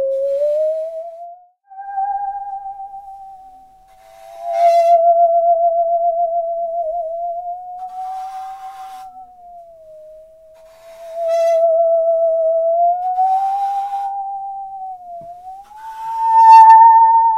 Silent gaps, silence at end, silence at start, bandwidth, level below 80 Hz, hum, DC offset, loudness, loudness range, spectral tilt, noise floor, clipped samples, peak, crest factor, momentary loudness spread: none; 0 s; 0 s; 9.6 kHz; -60 dBFS; none; under 0.1%; -14 LUFS; 13 LU; -1.5 dB/octave; -46 dBFS; under 0.1%; 0 dBFS; 16 dB; 23 LU